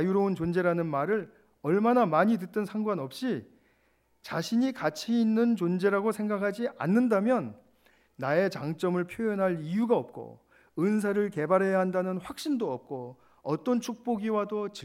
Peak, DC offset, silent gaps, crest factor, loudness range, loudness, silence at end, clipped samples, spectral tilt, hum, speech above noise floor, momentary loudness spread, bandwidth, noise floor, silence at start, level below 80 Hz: -10 dBFS; under 0.1%; none; 18 dB; 3 LU; -28 LUFS; 0 s; under 0.1%; -7 dB/octave; none; 41 dB; 12 LU; 15.5 kHz; -69 dBFS; 0 s; -70 dBFS